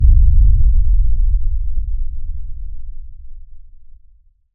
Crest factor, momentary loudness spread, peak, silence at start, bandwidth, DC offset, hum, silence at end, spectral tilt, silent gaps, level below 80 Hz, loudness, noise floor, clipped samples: 12 dB; 22 LU; -2 dBFS; 0 s; 0.4 kHz; under 0.1%; none; 0.7 s; -16.5 dB/octave; none; -14 dBFS; -18 LUFS; -47 dBFS; under 0.1%